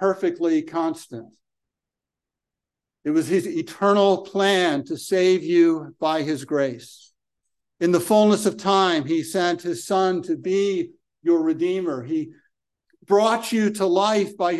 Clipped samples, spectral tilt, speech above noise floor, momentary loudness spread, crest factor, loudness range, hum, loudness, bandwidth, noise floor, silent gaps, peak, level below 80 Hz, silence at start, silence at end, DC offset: under 0.1%; -5 dB/octave; 66 dB; 10 LU; 16 dB; 5 LU; none; -21 LUFS; 12.5 kHz; -87 dBFS; none; -6 dBFS; -72 dBFS; 0 s; 0 s; under 0.1%